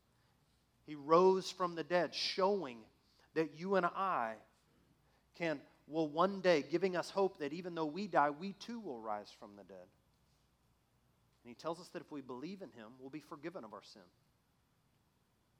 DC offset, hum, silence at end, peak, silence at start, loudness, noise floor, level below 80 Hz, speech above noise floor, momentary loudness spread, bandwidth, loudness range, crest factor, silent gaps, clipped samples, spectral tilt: under 0.1%; none; 1.6 s; -16 dBFS; 0.9 s; -37 LUFS; -76 dBFS; -82 dBFS; 39 dB; 20 LU; 12.5 kHz; 15 LU; 24 dB; none; under 0.1%; -5.5 dB/octave